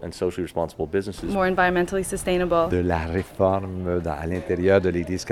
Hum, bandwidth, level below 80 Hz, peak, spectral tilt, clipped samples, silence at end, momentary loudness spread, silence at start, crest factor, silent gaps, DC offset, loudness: none; 15 kHz; -44 dBFS; -6 dBFS; -6 dB/octave; under 0.1%; 0 s; 8 LU; 0 s; 18 dB; none; under 0.1%; -24 LUFS